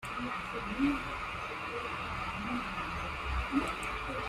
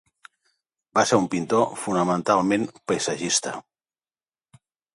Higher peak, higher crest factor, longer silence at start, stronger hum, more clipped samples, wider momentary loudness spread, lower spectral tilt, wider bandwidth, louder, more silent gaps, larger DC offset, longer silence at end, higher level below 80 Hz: second, -18 dBFS vs -4 dBFS; about the same, 18 dB vs 22 dB; second, 0 s vs 0.95 s; neither; neither; about the same, 5 LU vs 6 LU; about the same, -5 dB/octave vs -4 dB/octave; first, 15.5 kHz vs 11.5 kHz; second, -36 LUFS vs -23 LUFS; neither; neither; second, 0 s vs 1.35 s; first, -46 dBFS vs -64 dBFS